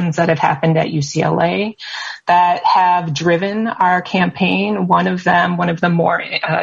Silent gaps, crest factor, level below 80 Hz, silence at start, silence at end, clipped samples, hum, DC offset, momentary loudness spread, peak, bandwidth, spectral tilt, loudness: none; 14 dB; -56 dBFS; 0 s; 0 s; under 0.1%; none; under 0.1%; 5 LU; -2 dBFS; 7.6 kHz; -6 dB/octave; -15 LUFS